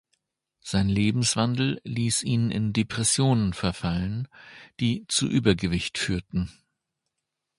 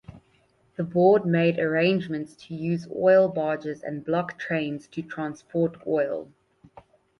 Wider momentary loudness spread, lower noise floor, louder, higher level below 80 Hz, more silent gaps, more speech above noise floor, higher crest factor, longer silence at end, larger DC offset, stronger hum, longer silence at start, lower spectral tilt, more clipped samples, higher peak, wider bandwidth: second, 9 LU vs 14 LU; first, -83 dBFS vs -64 dBFS; about the same, -25 LUFS vs -25 LUFS; first, -46 dBFS vs -64 dBFS; neither; first, 58 dB vs 40 dB; about the same, 20 dB vs 18 dB; first, 1.1 s vs 0.95 s; neither; neither; first, 0.65 s vs 0.1 s; second, -4.5 dB/octave vs -8 dB/octave; neither; about the same, -6 dBFS vs -6 dBFS; about the same, 11.5 kHz vs 11 kHz